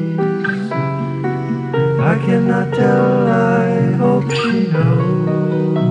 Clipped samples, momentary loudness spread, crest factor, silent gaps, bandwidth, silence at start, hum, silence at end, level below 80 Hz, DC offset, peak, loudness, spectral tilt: under 0.1%; 6 LU; 12 dB; none; 9.2 kHz; 0 s; none; 0 s; -56 dBFS; under 0.1%; -4 dBFS; -16 LUFS; -8 dB/octave